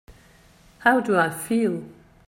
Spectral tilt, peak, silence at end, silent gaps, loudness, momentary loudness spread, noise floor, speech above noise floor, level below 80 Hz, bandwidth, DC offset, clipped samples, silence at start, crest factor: -5 dB/octave; -4 dBFS; 0.35 s; none; -22 LUFS; 6 LU; -54 dBFS; 32 dB; -58 dBFS; 16 kHz; under 0.1%; under 0.1%; 0.1 s; 20 dB